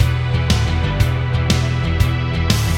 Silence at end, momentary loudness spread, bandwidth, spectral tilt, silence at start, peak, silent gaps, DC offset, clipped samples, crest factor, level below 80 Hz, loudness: 0 s; 2 LU; 16.5 kHz; -5.5 dB/octave; 0 s; 0 dBFS; none; under 0.1%; under 0.1%; 16 dB; -24 dBFS; -18 LUFS